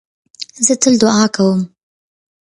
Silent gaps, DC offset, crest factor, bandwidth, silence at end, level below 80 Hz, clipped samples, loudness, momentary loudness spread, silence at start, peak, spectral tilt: none; under 0.1%; 16 dB; 11.5 kHz; 0.75 s; -56 dBFS; under 0.1%; -13 LUFS; 18 LU; 0.4 s; 0 dBFS; -4 dB/octave